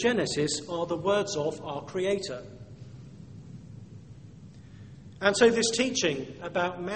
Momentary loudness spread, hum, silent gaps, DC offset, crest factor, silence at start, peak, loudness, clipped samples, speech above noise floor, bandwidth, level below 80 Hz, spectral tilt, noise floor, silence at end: 25 LU; none; none; under 0.1%; 24 dB; 0 s; -6 dBFS; -28 LUFS; under 0.1%; 20 dB; 8.8 kHz; -60 dBFS; -3.5 dB/octave; -48 dBFS; 0 s